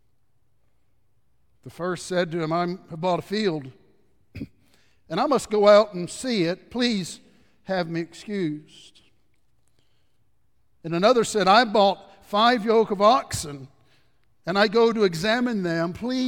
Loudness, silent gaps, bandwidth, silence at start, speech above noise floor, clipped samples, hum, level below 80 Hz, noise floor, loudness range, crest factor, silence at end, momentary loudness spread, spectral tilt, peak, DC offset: -22 LUFS; none; 17 kHz; 1.65 s; 49 dB; under 0.1%; none; -60 dBFS; -71 dBFS; 10 LU; 20 dB; 0 s; 18 LU; -4.5 dB/octave; -4 dBFS; 0.1%